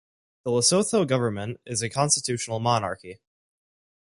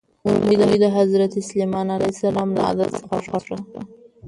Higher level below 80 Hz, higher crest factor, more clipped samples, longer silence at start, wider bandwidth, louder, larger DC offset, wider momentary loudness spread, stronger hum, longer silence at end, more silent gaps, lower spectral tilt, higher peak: second, -60 dBFS vs -54 dBFS; about the same, 20 dB vs 16 dB; neither; first, 0.45 s vs 0.25 s; about the same, 11.5 kHz vs 11.5 kHz; second, -24 LUFS vs -20 LUFS; neither; second, 13 LU vs 16 LU; neither; first, 0.9 s vs 0 s; neither; second, -3.5 dB/octave vs -6.5 dB/octave; about the same, -6 dBFS vs -4 dBFS